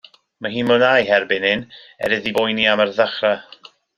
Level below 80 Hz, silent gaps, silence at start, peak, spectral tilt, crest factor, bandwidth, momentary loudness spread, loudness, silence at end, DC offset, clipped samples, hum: -58 dBFS; none; 0.4 s; 0 dBFS; -5 dB/octave; 18 dB; 14 kHz; 12 LU; -18 LUFS; 0.55 s; under 0.1%; under 0.1%; none